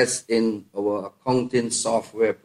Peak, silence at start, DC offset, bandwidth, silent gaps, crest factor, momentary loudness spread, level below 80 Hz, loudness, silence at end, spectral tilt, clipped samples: -6 dBFS; 0 s; under 0.1%; 14 kHz; none; 16 dB; 4 LU; -64 dBFS; -24 LUFS; 0.1 s; -4 dB/octave; under 0.1%